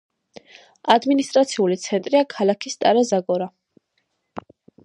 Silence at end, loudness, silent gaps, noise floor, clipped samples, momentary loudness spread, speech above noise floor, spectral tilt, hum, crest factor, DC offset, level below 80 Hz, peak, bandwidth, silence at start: 0.45 s; -20 LUFS; none; -72 dBFS; under 0.1%; 20 LU; 53 dB; -4.5 dB/octave; none; 20 dB; under 0.1%; -70 dBFS; 0 dBFS; 11 kHz; 0.85 s